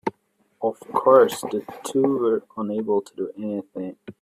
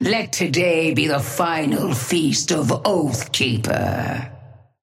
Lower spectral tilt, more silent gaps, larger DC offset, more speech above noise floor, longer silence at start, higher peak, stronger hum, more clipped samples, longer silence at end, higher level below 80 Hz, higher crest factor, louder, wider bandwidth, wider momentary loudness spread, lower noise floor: about the same, -5.5 dB/octave vs -4.5 dB/octave; neither; neither; first, 43 dB vs 23 dB; about the same, 0.05 s vs 0 s; about the same, -2 dBFS vs -4 dBFS; neither; neither; second, 0.1 s vs 0.25 s; second, -70 dBFS vs -54 dBFS; about the same, 20 dB vs 16 dB; second, -23 LUFS vs -20 LUFS; about the same, 15.5 kHz vs 16.5 kHz; first, 16 LU vs 5 LU; first, -66 dBFS vs -43 dBFS